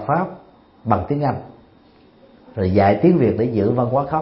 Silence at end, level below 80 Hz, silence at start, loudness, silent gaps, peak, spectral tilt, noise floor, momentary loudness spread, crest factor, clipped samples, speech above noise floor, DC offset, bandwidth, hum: 0 s; -48 dBFS; 0 s; -18 LUFS; none; 0 dBFS; -13 dB/octave; -51 dBFS; 15 LU; 18 dB; under 0.1%; 33 dB; under 0.1%; 5.8 kHz; none